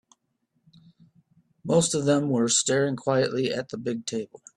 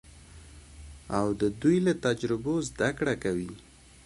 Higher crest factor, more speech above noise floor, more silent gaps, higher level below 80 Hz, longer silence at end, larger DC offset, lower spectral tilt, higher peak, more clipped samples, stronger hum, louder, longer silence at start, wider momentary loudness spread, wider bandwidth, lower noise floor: about the same, 18 dB vs 18 dB; first, 50 dB vs 22 dB; neither; second, -66 dBFS vs -52 dBFS; second, 0.3 s vs 0.45 s; neither; second, -4 dB/octave vs -6 dB/octave; first, -8 dBFS vs -12 dBFS; neither; neither; first, -25 LUFS vs -28 LUFS; first, 1.65 s vs 0.05 s; second, 10 LU vs 23 LU; about the same, 12.5 kHz vs 11.5 kHz; first, -74 dBFS vs -50 dBFS